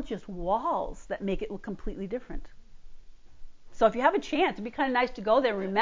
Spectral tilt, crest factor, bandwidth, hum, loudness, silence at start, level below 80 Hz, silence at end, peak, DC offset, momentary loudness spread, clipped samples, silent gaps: -6 dB/octave; 20 dB; 7.6 kHz; none; -29 LUFS; 0 s; -48 dBFS; 0 s; -8 dBFS; under 0.1%; 13 LU; under 0.1%; none